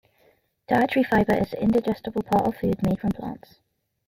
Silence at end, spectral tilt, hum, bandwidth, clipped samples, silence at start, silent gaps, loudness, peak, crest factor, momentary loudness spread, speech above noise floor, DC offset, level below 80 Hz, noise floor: 0.7 s; -7.5 dB/octave; none; 16 kHz; under 0.1%; 0.7 s; none; -24 LUFS; -8 dBFS; 18 dB; 9 LU; 40 dB; under 0.1%; -48 dBFS; -63 dBFS